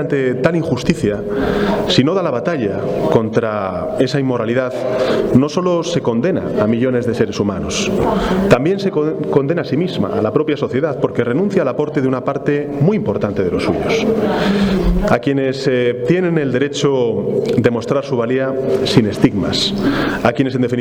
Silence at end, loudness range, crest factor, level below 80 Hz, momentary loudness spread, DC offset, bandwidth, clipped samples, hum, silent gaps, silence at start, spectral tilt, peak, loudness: 0 s; 1 LU; 16 dB; -34 dBFS; 4 LU; under 0.1%; 19 kHz; under 0.1%; none; none; 0 s; -6 dB/octave; 0 dBFS; -16 LUFS